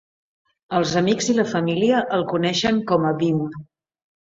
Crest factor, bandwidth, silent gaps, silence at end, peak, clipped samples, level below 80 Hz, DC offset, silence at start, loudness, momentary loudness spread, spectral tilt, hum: 18 dB; 8 kHz; none; 0.7 s; -4 dBFS; under 0.1%; -58 dBFS; under 0.1%; 0.7 s; -20 LUFS; 6 LU; -5 dB/octave; none